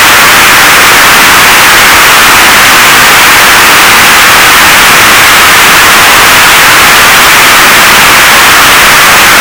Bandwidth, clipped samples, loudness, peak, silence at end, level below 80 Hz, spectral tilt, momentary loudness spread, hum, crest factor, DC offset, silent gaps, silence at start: over 20 kHz; 40%; 1 LUFS; 0 dBFS; 0 s; -28 dBFS; -0.5 dB/octave; 0 LU; none; 2 dB; under 0.1%; none; 0 s